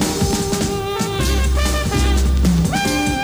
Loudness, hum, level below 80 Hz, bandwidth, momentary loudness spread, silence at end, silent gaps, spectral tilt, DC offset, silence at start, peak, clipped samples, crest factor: -18 LUFS; none; -20 dBFS; over 20 kHz; 4 LU; 0 s; none; -4.5 dB/octave; under 0.1%; 0 s; -4 dBFS; under 0.1%; 12 dB